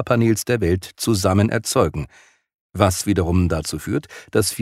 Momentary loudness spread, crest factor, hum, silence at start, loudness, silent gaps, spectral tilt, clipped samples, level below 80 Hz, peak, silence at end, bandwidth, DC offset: 8 LU; 18 dB; none; 0 s; -20 LUFS; 2.54-2.70 s; -5.5 dB/octave; under 0.1%; -40 dBFS; -2 dBFS; 0 s; 16 kHz; under 0.1%